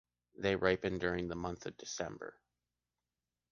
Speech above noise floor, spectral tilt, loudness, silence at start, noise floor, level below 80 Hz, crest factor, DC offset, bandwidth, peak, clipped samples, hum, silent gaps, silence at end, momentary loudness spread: over 53 dB; -4.5 dB/octave; -37 LUFS; 0.4 s; under -90 dBFS; -60 dBFS; 24 dB; under 0.1%; 7.2 kHz; -16 dBFS; under 0.1%; 60 Hz at -65 dBFS; none; 1.2 s; 12 LU